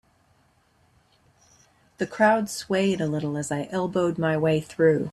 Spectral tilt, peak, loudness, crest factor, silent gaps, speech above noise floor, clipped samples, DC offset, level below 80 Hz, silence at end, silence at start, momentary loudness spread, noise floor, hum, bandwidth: -6 dB/octave; -6 dBFS; -24 LUFS; 20 dB; none; 40 dB; under 0.1%; under 0.1%; -62 dBFS; 0 s; 2 s; 8 LU; -63 dBFS; none; 13.5 kHz